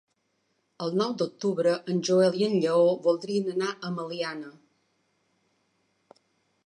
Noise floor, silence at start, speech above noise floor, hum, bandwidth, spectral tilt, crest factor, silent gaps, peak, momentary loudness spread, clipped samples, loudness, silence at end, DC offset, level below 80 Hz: -74 dBFS; 0.8 s; 48 dB; none; 10.5 kHz; -5.5 dB/octave; 16 dB; none; -12 dBFS; 11 LU; under 0.1%; -26 LUFS; 2.15 s; under 0.1%; -80 dBFS